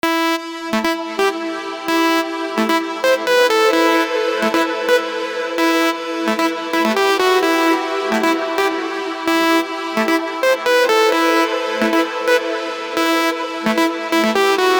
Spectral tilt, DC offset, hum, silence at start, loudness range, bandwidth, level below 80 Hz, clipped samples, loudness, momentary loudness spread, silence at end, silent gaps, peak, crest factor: -3 dB/octave; under 0.1%; none; 0.05 s; 1 LU; over 20 kHz; -62 dBFS; under 0.1%; -17 LUFS; 7 LU; 0 s; none; 0 dBFS; 16 dB